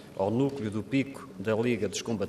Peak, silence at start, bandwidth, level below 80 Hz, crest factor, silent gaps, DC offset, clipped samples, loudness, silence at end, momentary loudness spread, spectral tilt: -14 dBFS; 0 s; 14 kHz; -66 dBFS; 16 dB; none; under 0.1%; under 0.1%; -30 LUFS; 0 s; 7 LU; -6 dB/octave